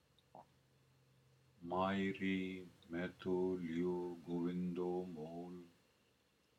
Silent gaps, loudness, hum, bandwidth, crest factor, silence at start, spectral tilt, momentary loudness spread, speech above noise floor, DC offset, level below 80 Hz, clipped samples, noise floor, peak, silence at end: none; -42 LUFS; none; 10 kHz; 18 dB; 0.35 s; -7.5 dB/octave; 12 LU; 35 dB; under 0.1%; -78 dBFS; under 0.1%; -76 dBFS; -26 dBFS; 0.9 s